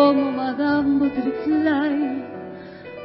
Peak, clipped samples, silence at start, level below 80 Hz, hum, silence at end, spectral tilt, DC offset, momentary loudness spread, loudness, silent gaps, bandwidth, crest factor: -4 dBFS; under 0.1%; 0 s; -54 dBFS; none; 0 s; -10.5 dB/octave; under 0.1%; 17 LU; -21 LUFS; none; 5.6 kHz; 16 dB